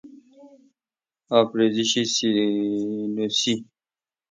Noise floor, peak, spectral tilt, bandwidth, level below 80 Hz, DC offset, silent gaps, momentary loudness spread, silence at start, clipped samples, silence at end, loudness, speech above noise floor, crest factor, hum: under -90 dBFS; -4 dBFS; -3.5 dB/octave; 9.4 kHz; -70 dBFS; under 0.1%; none; 6 LU; 0.05 s; under 0.1%; 0.7 s; -22 LUFS; over 68 dB; 20 dB; none